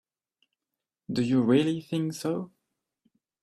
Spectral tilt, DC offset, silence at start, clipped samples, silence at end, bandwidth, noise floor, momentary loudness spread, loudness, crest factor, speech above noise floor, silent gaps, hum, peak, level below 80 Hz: -6.5 dB/octave; under 0.1%; 1.1 s; under 0.1%; 0.95 s; 13 kHz; -88 dBFS; 12 LU; -27 LUFS; 20 dB; 62 dB; none; none; -10 dBFS; -68 dBFS